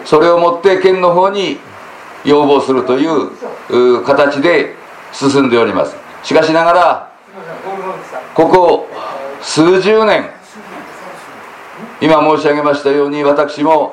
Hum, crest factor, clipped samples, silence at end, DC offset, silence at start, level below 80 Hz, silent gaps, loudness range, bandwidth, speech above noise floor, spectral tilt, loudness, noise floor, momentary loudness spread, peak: none; 12 dB; 0.1%; 0 s; under 0.1%; 0 s; -50 dBFS; none; 2 LU; 11 kHz; 22 dB; -5 dB/octave; -11 LUFS; -32 dBFS; 21 LU; 0 dBFS